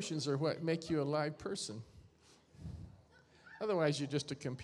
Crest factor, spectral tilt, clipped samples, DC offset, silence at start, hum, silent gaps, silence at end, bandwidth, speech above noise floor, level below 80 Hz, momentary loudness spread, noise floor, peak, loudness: 18 dB; -5.5 dB/octave; under 0.1%; under 0.1%; 0 s; none; none; 0 s; 12 kHz; 28 dB; -64 dBFS; 19 LU; -65 dBFS; -20 dBFS; -37 LUFS